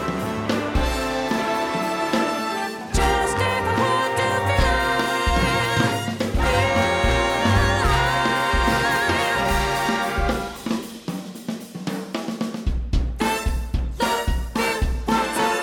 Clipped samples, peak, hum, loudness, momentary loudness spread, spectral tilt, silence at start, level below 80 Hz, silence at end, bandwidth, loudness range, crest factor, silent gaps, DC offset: under 0.1%; -6 dBFS; none; -22 LUFS; 9 LU; -4.5 dB/octave; 0 s; -28 dBFS; 0 s; 18 kHz; 7 LU; 16 dB; none; under 0.1%